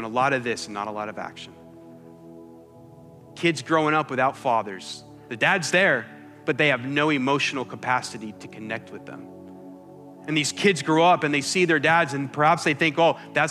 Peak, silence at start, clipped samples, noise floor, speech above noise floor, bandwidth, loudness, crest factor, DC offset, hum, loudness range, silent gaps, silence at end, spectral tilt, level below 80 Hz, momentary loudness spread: -6 dBFS; 0 s; under 0.1%; -47 dBFS; 24 dB; 13.5 kHz; -22 LUFS; 18 dB; under 0.1%; none; 9 LU; none; 0 s; -4 dB/octave; -74 dBFS; 20 LU